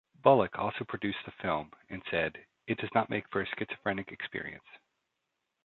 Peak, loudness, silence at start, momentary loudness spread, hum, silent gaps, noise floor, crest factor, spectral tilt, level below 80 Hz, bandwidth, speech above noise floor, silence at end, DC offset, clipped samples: -10 dBFS; -32 LUFS; 0.25 s; 16 LU; none; none; -84 dBFS; 24 dB; -4 dB/octave; -64 dBFS; 4.4 kHz; 52 dB; 0.9 s; under 0.1%; under 0.1%